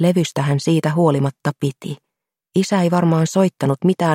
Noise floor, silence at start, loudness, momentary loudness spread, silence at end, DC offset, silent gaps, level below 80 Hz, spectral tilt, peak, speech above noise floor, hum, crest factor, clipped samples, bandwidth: -67 dBFS; 0 s; -18 LUFS; 8 LU; 0 s; under 0.1%; none; -60 dBFS; -6.5 dB/octave; -2 dBFS; 50 dB; none; 14 dB; under 0.1%; 16 kHz